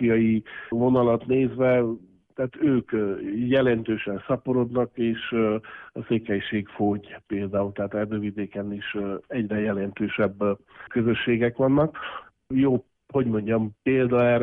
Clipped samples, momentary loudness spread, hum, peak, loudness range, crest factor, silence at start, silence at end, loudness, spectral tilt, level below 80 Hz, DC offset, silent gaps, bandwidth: under 0.1%; 10 LU; none; -10 dBFS; 5 LU; 14 dB; 0 s; 0 s; -25 LUFS; -10.5 dB/octave; -56 dBFS; under 0.1%; none; 4 kHz